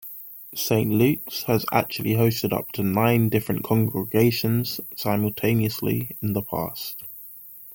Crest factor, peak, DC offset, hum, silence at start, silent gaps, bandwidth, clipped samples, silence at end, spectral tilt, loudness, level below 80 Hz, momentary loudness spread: 18 dB; -6 dBFS; under 0.1%; none; 0 s; none; 17 kHz; under 0.1%; 0 s; -6 dB/octave; -23 LUFS; -56 dBFS; 13 LU